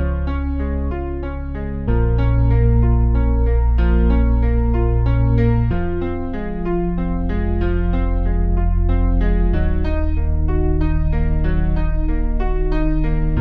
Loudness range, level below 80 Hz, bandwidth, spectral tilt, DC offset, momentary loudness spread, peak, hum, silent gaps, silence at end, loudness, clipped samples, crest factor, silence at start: 4 LU; -18 dBFS; 4.4 kHz; -11 dB/octave; under 0.1%; 7 LU; -4 dBFS; none; none; 0 s; -20 LUFS; under 0.1%; 12 dB; 0 s